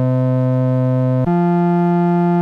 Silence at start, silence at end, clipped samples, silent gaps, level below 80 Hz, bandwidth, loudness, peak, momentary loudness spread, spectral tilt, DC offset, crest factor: 0 s; 0 s; under 0.1%; none; -50 dBFS; 4.4 kHz; -16 LUFS; -8 dBFS; 1 LU; -11 dB/octave; under 0.1%; 6 dB